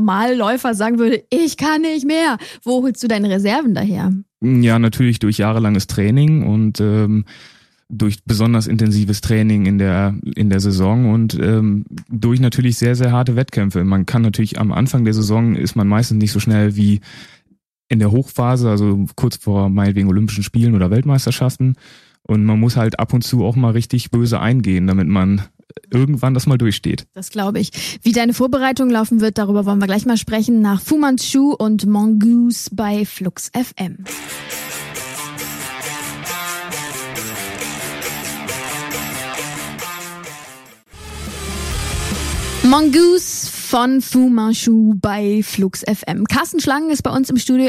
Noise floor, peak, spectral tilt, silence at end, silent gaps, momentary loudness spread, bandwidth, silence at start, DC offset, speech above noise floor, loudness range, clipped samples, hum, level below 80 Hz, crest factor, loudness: -60 dBFS; 0 dBFS; -6 dB/octave; 0 s; none; 11 LU; 16 kHz; 0 s; under 0.1%; 45 dB; 9 LU; under 0.1%; none; -40 dBFS; 16 dB; -16 LUFS